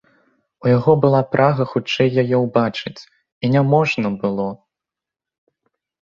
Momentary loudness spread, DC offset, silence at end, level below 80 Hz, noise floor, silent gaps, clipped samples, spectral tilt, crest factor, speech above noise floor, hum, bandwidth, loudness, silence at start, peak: 10 LU; under 0.1%; 1.6 s; -56 dBFS; -87 dBFS; 3.32-3.41 s; under 0.1%; -7.5 dB/octave; 18 dB; 70 dB; none; 7.4 kHz; -18 LUFS; 0.65 s; -2 dBFS